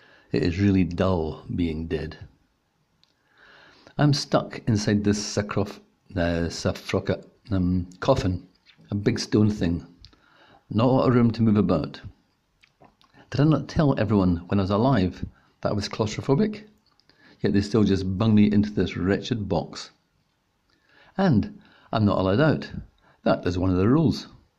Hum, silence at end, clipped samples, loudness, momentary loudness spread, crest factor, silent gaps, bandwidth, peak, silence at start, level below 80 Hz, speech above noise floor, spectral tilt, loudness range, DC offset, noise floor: none; 0.3 s; under 0.1%; -24 LUFS; 12 LU; 18 dB; none; 11 kHz; -6 dBFS; 0.35 s; -48 dBFS; 47 dB; -7 dB/octave; 4 LU; under 0.1%; -70 dBFS